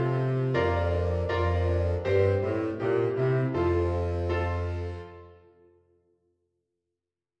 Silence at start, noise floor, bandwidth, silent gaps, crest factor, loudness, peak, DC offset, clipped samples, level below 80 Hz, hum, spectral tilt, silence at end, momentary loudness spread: 0 s; -88 dBFS; 6.6 kHz; none; 16 dB; -27 LUFS; -12 dBFS; under 0.1%; under 0.1%; -42 dBFS; none; -9 dB/octave; 2.05 s; 6 LU